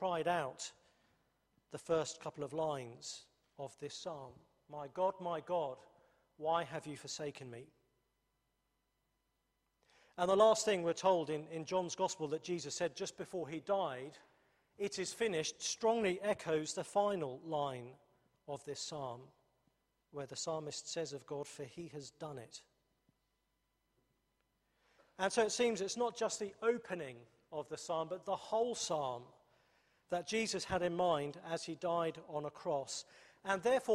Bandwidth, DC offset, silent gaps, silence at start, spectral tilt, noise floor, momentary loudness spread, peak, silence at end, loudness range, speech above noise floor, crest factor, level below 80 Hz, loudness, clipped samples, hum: 14 kHz; under 0.1%; none; 0 s; -3.5 dB/octave; -83 dBFS; 16 LU; -16 dBFS; 0 s; 10 LU; 45 dB; 24 dB; -78 dBFS; -39 LUFS; under 0.1%; none